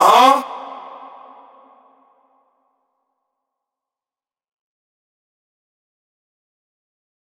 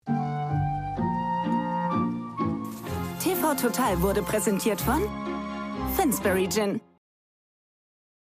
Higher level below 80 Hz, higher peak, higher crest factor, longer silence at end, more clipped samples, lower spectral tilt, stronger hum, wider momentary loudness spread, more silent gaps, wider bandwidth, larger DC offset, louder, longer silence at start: second, -84 dBFS vs -44 dBFS; first, 0 dBFS vs -12 dBFS; first, 22 dB vs 16 dB; first, 6.6 s vs 1.45 s; neither; second, -1.5 dB/octave vs -5 dB/octave; neither; first, 28 LU vs 8 LU; neither; about the same, 16.5 kHz vs 15.5 kHz; neither; first, -12 LUFS vs -27 LUFS; about the same, 0 s vs 0.05 s